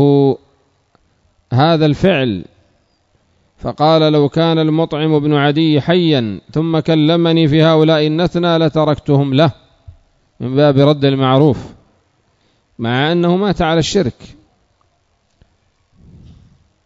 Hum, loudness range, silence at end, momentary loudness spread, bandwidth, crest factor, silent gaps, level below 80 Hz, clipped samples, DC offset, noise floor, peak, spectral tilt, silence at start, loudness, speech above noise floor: none; 5 LU; 2.75 s; 9 LU; 7.8 kHz; 14 dB; none; -44 dBFS; under 0.1%; under 0.1%; -60 dBFS; 0 dBFS; -7 dB/octave; 0 s; -13 LUFS; 48 dB